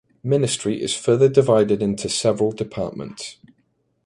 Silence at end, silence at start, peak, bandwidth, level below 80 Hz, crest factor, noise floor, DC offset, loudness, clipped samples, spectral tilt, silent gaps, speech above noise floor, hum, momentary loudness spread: 0.7 s; 0.25 s; -2 dBFS; 11.5 kHz; -54 dBFS; 18 dB; -67 dBFS; under 0.1%; -20 LUFS; under 0.1%; -5 dB/octave; none; 47 dB; none; 16 LU